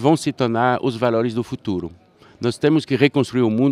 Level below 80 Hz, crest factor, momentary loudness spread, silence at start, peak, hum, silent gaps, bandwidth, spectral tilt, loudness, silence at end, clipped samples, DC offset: -56 dBFS; 18 dB; 8 LU; 0 s; -2 dBFS; none; none; 13 kHz; -6.5 dB/octave; -20 LUFS; 0 s; under 0.1%; under 0.1%